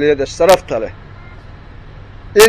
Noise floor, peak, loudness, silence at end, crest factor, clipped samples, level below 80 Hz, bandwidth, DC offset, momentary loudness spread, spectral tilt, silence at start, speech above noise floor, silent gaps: -35 dBFS; 0 dBFS; -14 LUFS; 0 s; 14 dB; 0.1%; -36 dBFS; 16 kHz; under 0.1%; 26 LU; -3 dB/octave; 0 s; 21 dB; none